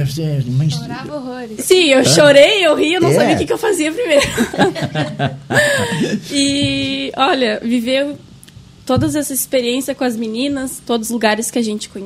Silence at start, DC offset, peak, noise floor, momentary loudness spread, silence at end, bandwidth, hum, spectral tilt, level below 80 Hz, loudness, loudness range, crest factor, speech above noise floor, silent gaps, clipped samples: 0 s; under 0.1%; 0 dBFS; -40 dBFS; 12 LU; 0 s; 16 kHz; none; -4 dB/octave; -46 dBFS; -14 LUFS; 7 LU; 16 dB; 25 dB; none; under 0.1%